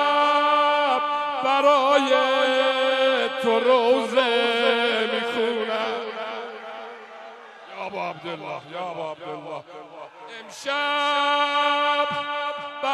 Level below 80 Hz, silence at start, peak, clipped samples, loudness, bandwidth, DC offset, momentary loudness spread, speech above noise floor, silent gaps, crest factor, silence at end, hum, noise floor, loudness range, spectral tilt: -80 dBFS; 0 s; -6 dBFS; under 0.1%; -21 LUFS; 12.5 kHz; under 0.1%; 19 LU; 20 dB; none; 18 dB; 0 s; none; -42 dBFS; 14 LU; -3 dB/octave